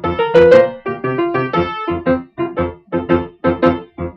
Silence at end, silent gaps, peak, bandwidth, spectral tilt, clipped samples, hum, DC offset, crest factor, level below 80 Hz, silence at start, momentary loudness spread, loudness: 0.05 s; none; -2 dBFS; 6.6 kHz; -8 dB/octave; under 0.1%; none; under 0.1%; 14 dB; -40 dBFS; 0 s; 13 LU; -15 LUFS